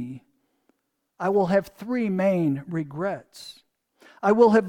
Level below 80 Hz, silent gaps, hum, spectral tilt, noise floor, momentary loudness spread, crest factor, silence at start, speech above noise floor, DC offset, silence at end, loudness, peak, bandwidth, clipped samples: -64 dBFS; none; none; -7.5 dB/octave; -70 dBFS; 22 LU; 18 dB; 0 s; 48 dB; under 0.1%; 0 s; -24 LUFS; -6 dBFS; 16 kHz; under 0.1%